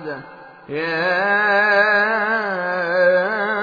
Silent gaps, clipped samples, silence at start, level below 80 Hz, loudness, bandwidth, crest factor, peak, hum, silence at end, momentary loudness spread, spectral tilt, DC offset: none; under 0.1%; 0 s; -68 dBFS; -17 LUFS; 5 kHz; 16 dB; -2 dBFS; none; 0 s; 11 LU; -6 dB/octave; under 0.1%